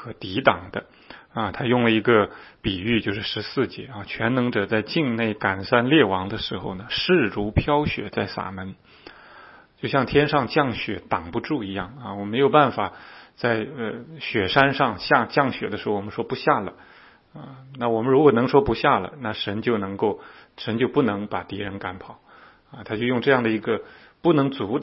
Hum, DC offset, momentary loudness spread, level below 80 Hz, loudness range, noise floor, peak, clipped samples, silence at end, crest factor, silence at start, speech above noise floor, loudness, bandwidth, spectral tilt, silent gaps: none; under 0.1%; 14 LU; -48 dBFS; 3 LU; -48 dBFS; 0 dBFS; under 0.1%; 0 s; 24 dB; 0 s; 25 dB; -23 LUFS; 5.8 kHz; -9.5 dB/octave; none